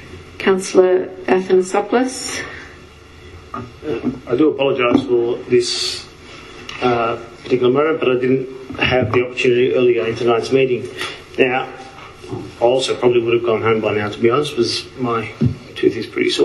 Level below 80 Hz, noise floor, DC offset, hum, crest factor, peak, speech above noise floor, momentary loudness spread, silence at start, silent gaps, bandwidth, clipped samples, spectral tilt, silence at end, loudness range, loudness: -48 dBFS; -40 dBFS; under 0.1%; none; 18 dB; 0 dBFS; 24 dB; 16 LU; 0 s; none; 12 kHz; under 0.1%; -5 dB/octave; 0 s; 3 LU; -17 LUFS